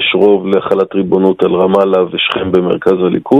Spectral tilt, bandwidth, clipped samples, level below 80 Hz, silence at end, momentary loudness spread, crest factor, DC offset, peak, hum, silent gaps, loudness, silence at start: -7.5 dB/octave; 5.2 kHz; 0.1%; -44 dBFS; 0 s; 3 LU; 10 dB; under 0.1%; 0 dBFS; none; none; -12 LUFS; 0 s